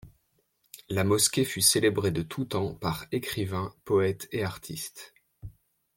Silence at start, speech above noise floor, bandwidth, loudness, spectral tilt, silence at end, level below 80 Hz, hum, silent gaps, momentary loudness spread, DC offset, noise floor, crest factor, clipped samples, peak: 0.05 s; 44 dB; 17 kHz; -27 LUFS; -3.5 dB/octave; 0.5 s; -58 dBFS; none; none; 14 LU; under 0.1%; -72 dBFS; 22 dB; under 0.1%; -8 dBFS